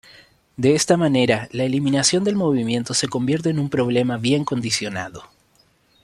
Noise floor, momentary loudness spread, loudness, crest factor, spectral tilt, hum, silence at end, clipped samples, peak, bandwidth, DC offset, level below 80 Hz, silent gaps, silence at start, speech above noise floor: -59 dBFS; 6 LU; -20 LUFS; 18 dB; -4.5 dB/octave; none; 0.8 s; under 0.1%; -4 dBFS; 13 kHz; under 0.1%; -58 dBFS; none; 0.6 s; 40 dB